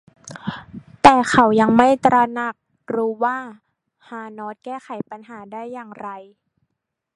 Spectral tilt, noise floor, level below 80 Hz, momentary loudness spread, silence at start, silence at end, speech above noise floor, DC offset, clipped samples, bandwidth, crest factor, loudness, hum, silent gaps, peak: -5 dB/octave; -79 dBFS; -52 dBFS; 22 LU; 0.25 s; 0.95 s; 59 dB; under 0.1%; under 0.1%; 11.5 kHz; 20 dB; -16 LUFS; none; none; 0 dBFS